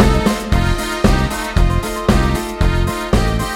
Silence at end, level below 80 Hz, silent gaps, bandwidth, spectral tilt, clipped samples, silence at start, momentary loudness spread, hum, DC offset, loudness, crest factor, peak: 0 s; -20 dBFS; none; 16.5 kHz; -5.5 dB/octave; under 0.1%; 0 s; 3 LU; none; under 0.1%; -17 LUFS; 14 dB; -2 dBFS